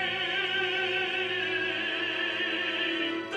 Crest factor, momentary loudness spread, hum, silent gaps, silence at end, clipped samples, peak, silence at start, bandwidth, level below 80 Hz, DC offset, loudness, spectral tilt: 14 dB; 2 LU; none; none; 0 s; under 0.1%; -16 dBFS; 0 s; 10.5 kHz; -76 dBFS; under 0.1%; -28 LUFS; -3.5 dB/octave